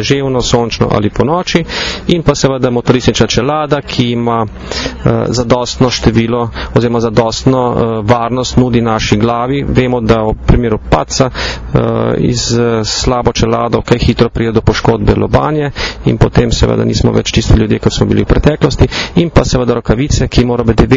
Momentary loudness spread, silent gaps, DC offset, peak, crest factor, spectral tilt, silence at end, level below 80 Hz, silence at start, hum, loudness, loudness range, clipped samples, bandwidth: 3 LU; none; under 0.1%; 0 dBFS; 10 dB; -5.5 dB/octave; 0 s; -22 dBFS; 0 s; none; -12 LUFS; 2 LU; 0.7%; 7.6 kHz